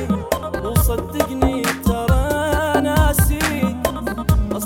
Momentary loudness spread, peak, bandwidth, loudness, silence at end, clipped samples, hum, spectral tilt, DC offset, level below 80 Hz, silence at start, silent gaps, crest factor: 6 LU; -2 dBFS; 19 kHz; -19 LUFS; 0 s; under 0.1%; none; -5.5 dB/octave; under 0.1%; -24 dBFS; 0 s; none; 16 dB